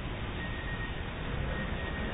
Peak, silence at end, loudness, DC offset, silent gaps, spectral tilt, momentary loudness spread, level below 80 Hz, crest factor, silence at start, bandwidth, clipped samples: -24 dBFS; 0 s; -37 LUFS; under 0.1%; none; -4 dB/octave; 3 LU; -40 dBFS; 12 dB; 0 s; 3.9 kHz; under 0.1%